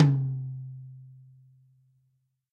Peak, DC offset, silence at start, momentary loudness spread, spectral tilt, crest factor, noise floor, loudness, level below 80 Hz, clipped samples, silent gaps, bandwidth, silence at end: -8 dBFS; under 0.1%; 0 s; 25 LU; -9.5 dB/octave; 22 dB; -73 dBFS; -30 LUFS; -68 dBFS; under 0.1%; none; 5 kHz; 1.4 s